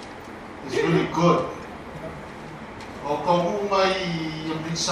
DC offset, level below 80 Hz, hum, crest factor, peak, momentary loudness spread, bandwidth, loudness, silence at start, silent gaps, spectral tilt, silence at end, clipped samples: under 0.1%; -52 dBFS; none; 18 dB; -6 dBFS; 17 LU; 12.5 kHz; -24 LUFS; 0 s; none; -5 dB/octave; 0 s; under 0.1%